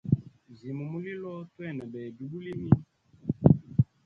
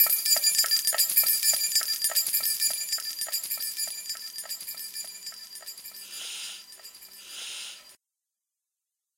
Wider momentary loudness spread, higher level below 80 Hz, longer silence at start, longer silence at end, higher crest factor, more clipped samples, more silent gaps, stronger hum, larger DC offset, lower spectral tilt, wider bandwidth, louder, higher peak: about the same, 17 LU vs 19 LU; first, -50 dBFS vs -82 dBFS; about the same, 0.05 s vs 0 s; second, 0.2 s vs 1.25 s; about the same, 26 dB vs 24 dB; neither; neither; neither; neither; first, -11.5 dB/octave vs 4 dB/octave; second, 4.5 kHz vs 17 kHz; second, -30 LUFS vs -24 LUFS; about the same, -2 dBFS vs -4 dBFS